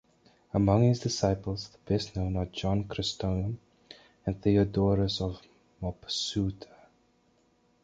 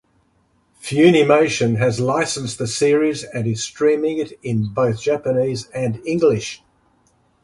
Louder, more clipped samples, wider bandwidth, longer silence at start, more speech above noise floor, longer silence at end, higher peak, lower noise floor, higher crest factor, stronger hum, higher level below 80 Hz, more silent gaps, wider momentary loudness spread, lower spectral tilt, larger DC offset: second, -30 LUFS vs -18 LUFS; neither; second, 9 kHz vs 11.5 kHz; second, 0.55 s vs 0.85 s; second, 39 dB vs 43 dB; first, 1.2 s vs 0.9 s; second, -10 dBFS vs 0 dBFS; first, -68 dBFS vs -61 dBFS; about the same, 20 dB vs 18 dB; neither; first, -46 dBFS vs -54 dBFS; neither; first, 13 LU vs 10 LU; about the same, -6.5 dB/octave vs -5.5 dB/octave; neither